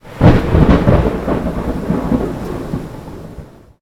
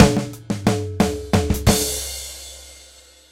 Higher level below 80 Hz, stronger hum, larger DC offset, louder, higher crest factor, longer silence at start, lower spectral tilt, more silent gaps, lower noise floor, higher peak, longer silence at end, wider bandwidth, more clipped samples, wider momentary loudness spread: first, -22 dBFS vs -32 dBFS; neither; neither; first, -15 LUFS vs -21 LUFS; second, 14 dB vs 20 dB; about the same, 0.05 s vs 0 s; first, -8.5 dB/octave vs -5 dB/octave; neither; second, -35 dBFS vs -47 dBFS; about the same, 0 dBFS vs 0 dBFS; second, 0.35 s vs 0.55 s; second, 15 kHz vs 17 kHz; first, 0.5% vs under 0.1%; first, 21 LU vs 18 LU